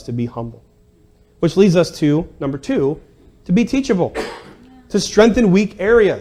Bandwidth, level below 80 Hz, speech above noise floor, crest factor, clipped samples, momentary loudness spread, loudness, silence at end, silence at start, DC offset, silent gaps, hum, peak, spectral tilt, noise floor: 13.5 kHz; -40 dBFS; 36 dB; 16 dB; under 0.1%; 15 LU; -16 LUFS; 0 s; 0.05 s; under 0.1%; none; none; 0 dBFS; -6 dB/octave; -51 dBFS